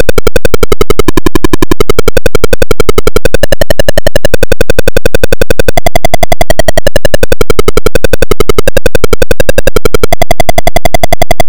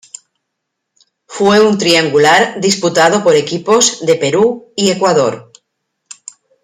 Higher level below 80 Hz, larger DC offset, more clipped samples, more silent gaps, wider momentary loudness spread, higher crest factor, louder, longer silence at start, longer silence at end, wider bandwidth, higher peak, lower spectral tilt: first, -12 dBFS vs -56 dBFS; neither; first, 90% vs under 0.1%; neither; second, 1 LU vs 14 LU; second, 2 dB vs 14 dB; about the same, -10 LUFS vs -11 LUFS; second, 0 s vs 1.3 s; second, 0 s vs 1.2 s; first, over 20 kHz vs 15.5 kHz; about the same, 0 dBFS vs 0 dBFS; about the same, -4.5 dB/octave vs -3.5 dB/octave